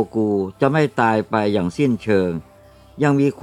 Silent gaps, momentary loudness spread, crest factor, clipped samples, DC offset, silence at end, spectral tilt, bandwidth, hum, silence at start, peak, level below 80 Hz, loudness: none; 4 LU; 16 dB; under 0.1%; under 0.1%; 0 s; -7.5 dB/octave; 11.5 kHz; none; 0 s; -2 dBFS; -54 dBFS; -19 LUFS